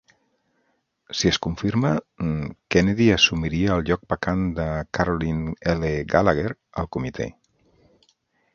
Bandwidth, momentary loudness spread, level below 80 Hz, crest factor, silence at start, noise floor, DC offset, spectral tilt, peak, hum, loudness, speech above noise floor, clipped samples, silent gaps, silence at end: 7.2 kHz; 11 LU; -40 dBFS; 22 dB; 1.1 s; -70 dBFS; under 0.1%; -5.5 dB/octave; -2 dBFS; none; -23 LUFS; 48 dB; under 0.1%; none; 1.25 s